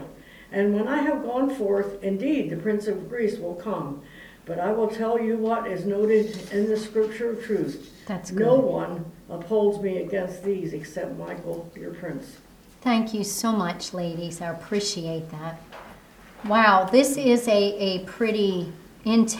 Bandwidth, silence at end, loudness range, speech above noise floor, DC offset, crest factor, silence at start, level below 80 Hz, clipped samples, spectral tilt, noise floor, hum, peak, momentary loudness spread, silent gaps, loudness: 19 kHz; 0 s; 7 LU; 23 dB; under 0.1%; 22 dB; 0 s; -58 dBFS; under 0.1%; -5 dB/octave; -48 dBFS; none; -4 dBFS; 16 LU; none; -25 LUFS